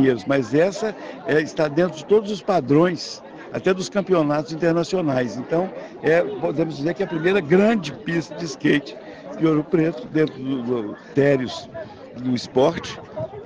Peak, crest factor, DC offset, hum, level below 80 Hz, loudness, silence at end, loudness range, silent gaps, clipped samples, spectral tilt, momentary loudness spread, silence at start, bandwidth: -4 dBFS; 16 dB; under 0.1%; none; -58 dBFS; -21 LUFS; 0 s; 2 LU; none; under 0.1%; -6.5 dB/octave; 13 LU; 0 s; 9.8 kHz